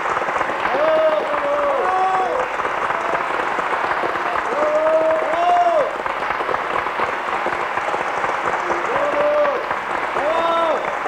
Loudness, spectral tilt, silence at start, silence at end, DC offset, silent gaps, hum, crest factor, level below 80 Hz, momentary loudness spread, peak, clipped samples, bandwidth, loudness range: -19 LUFS; -4 dB/octave; 0 s; 0 s; under 0.1%; none; none; 14 dB; -54 dBFS; 5 LU; -6 dBFS; under 0.1%; 12.5 kHz; 2 LU